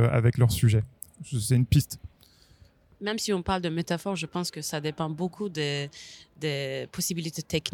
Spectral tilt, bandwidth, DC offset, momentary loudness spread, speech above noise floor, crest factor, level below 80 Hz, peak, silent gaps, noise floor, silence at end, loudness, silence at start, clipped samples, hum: -5.5 dB/octave; 18 kHz; under 0.1%; 13 LU; 31 dB; 20 dB; -48 dBFS; -8 dBFS; none; -58 dBFS; 0.05 s; -28 LUFS; 0 s; under 0.1%; none